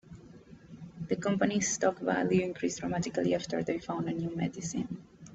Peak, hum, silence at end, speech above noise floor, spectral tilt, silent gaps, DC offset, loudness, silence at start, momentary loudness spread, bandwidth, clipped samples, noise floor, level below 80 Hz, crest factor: -12 dBFS; none; 0 s; 22 dB; -5 dB/octave; none; under 0.1%; -32 LUFS; 0.05 s; 18 LU; 8.2 kHz; under 0.1%; -53 dBFS; -62 dBFS; 20 dB